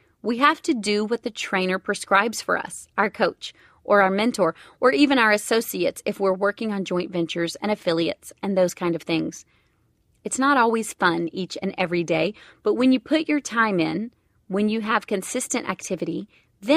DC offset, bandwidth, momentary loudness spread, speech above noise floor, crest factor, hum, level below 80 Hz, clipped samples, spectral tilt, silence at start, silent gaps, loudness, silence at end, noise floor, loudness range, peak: under 0.1%; 15.5 kHz; 10 LU; 42 dB; 20 dB; none; -64 dBFS; under 0.1%; -4 dB/octave; 0.25 s; none; -23 LUFS; 0 s; -65 dBFS; 4 LU; -2 dBFS